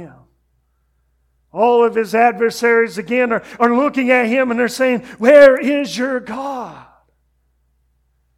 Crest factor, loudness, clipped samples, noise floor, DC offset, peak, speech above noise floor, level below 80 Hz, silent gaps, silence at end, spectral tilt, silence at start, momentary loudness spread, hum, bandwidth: 16 dB; -14 LUFS; 0.1%; -63 dBFS; under 0.1%; 0 dBFS; 49 dB; -58 dBFS; none; 1.6 s; -4.5 dB/octave; 0 s; 15 LU; none; 14.5 kHz